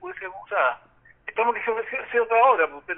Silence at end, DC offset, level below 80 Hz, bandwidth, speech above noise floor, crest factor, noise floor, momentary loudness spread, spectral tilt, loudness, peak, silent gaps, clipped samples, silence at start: 0 s; under 0.1%; -66 dBFS; 3.8 kHz; 21 dB; 18 dB; -43 dBFS; 17 LU; 5.5 dB/octave; -23 LUFS; -6 dBFS; none; under 0.1%; 0 s